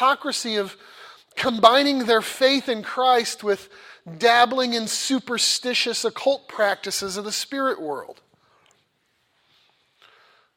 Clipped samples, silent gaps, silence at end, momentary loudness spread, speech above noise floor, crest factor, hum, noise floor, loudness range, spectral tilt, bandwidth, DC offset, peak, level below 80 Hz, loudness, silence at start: under 0.1%; none; 2.45 s; 11 LU; 47 dB; 24 dB; none; -68 dBFS; 9 LU; -2 dB/octave; 16.5 kHz; under 0.1%; 0 dBFS; -68 dBFS; -21 LUFS; 0 s